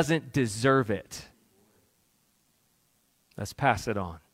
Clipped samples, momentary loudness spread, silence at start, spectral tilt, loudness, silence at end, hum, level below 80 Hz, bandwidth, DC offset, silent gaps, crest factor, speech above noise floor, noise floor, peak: under 0.1%; 19 LU; 0 s; -5.5 dB/octave; -28 LUFS; 0.15 s; none; -58 dBFS; 16 kHz; under 0.1%; none; 24 dB; 42 dB; -70 dBFS; -8 dBFS